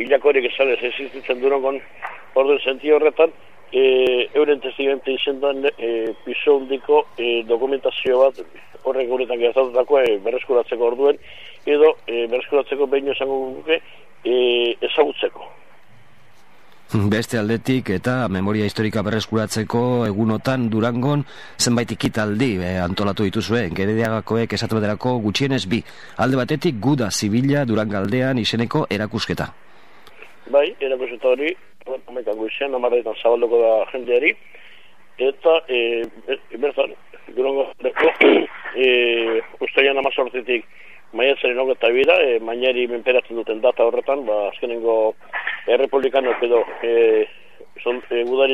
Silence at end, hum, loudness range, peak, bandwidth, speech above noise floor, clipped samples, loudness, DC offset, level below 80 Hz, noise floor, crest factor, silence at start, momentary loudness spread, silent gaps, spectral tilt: 0 s; none; 4 LU; 0 dBFS; 13.5 kHz; 34 dB; under 0.1%; -19 LUFS; 0.9%; -56 dBFS; -53 dBFS; 20 dB; 0 s; 9 LU; none; -5.5 dB/octave